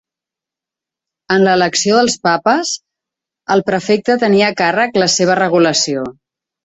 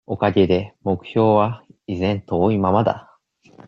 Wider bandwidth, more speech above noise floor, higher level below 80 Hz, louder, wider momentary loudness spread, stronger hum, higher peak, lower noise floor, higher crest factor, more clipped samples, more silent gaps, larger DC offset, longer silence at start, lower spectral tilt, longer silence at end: first, 8.4 kHz vs 6.8 kHz; first, 73 dB vs 35 dB; about the same, -56 dBFS vs -54 dBFS; first, -13 LUFS vs -20 LUFS; about the same, 7 LU vs 9 LU; neither; about the same, 0 dBFS vs -2 dBFS; first, -86 dBFS vs -54 dBFS; about the same, 14 dB vs 18 dB; neither; neither; neither; first, 1.3 s vs 0.1 s; second, -3.5 dB/octave vs -9 dB/octave; about the same, 0.55 s vs 0.65 s